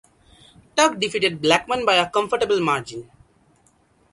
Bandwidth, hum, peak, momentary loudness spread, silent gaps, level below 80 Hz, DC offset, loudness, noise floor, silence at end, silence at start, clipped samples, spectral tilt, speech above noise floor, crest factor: 11.5 kHz; none; 0 dBFS; 8 LU; none; -58 dBFS; under 0.1%; -20 LUFS; -60 dBFS; 1.1 s; 0.75 s; under 0.1%; -3 dB/octave; 40 dB; 22 dB